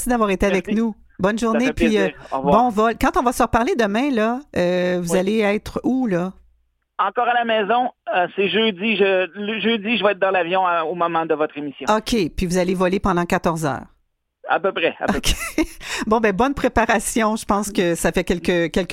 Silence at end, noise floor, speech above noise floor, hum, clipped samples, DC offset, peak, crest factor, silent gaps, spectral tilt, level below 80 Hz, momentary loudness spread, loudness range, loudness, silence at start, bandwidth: 0 s; -66 dBFS; 47 dB; none; under 0.1%; under 0.1%; -2 dBFS; 18 dB; none; -4.5 dB/octave; -38 dBFS; 5 LU; 3 LU; -20 LUFS; 0 s; 16.5 kHz